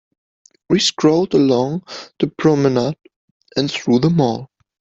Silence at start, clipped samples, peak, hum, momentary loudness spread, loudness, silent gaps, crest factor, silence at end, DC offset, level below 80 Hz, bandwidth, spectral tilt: 0.7 s; under 0.1%; -2 dBFS; none; 12 LU; -17 LUFS; 3.16-3.40 s; 16 dB; 0.35 s; under 0.1%; -54 dBFS; 8.2 kHz; -5.5 dB/octave